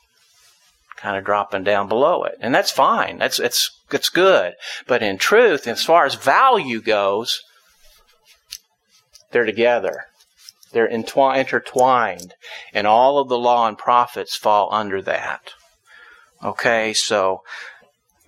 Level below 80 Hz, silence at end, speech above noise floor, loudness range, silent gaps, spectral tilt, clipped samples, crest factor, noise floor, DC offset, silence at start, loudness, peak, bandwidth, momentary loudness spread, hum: -66 dBFS; 0.55 s; 42 dB; 6 LU; none; -2.5 dB/octave; under 0.1%; 18 dB; -60 dBFS; under 0.1%; 1 s; -18 LUFS; 0 dBFS; 16.5 kHz; 15 LU; none